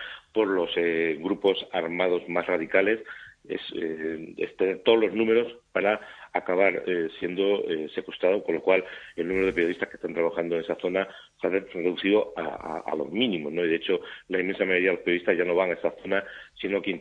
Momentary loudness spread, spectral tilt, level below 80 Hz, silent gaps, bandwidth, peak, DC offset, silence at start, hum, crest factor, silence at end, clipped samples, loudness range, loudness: 10 LU; -6.5 dB/octave; -62 dBFS; none; 7 kHz; -6 dBFS; under 0.1%; 0 s; none; 22 dB; 0 s; under 0.1%; 2 LU; -26 LUFS